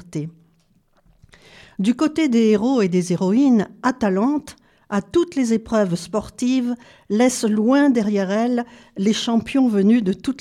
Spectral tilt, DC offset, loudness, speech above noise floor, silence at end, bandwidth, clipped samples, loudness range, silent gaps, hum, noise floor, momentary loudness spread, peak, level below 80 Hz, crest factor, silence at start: -6 dB/octave; under 0.1%; -19 LUFS; 41 dB; 0 s; 13 kHz; under 0.1%; 3 LU; none; none; -60 dBFS; 10 LU; -6 dBFS; -54 dBFS; 14 dB; 0.1 s